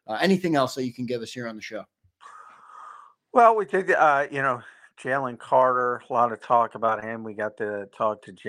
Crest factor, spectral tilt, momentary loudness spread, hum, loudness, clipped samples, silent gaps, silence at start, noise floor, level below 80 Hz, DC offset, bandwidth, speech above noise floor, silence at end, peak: 20 dB; -5.5 dB/octave; 15 LU; none; -24 LUFS; under 0.1%; none; 0.1 s; -49 dBFS; -72 dBFS; under 0.1%; 15 kHz; 25 dB; 0 s; -4 dBFS